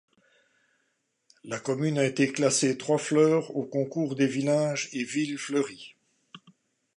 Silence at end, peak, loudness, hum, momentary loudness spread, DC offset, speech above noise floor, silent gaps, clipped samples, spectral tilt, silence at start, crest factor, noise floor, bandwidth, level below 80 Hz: 0.6 s; -10 dBFS; -27 LUFS; none; 10 LU; under 0.1%; 49 dB; none; under 0.1%; -4.5 dB/octave; 1.45 s; 20 dB; -75 dBFS; 11.5 kHz; -78 dBFS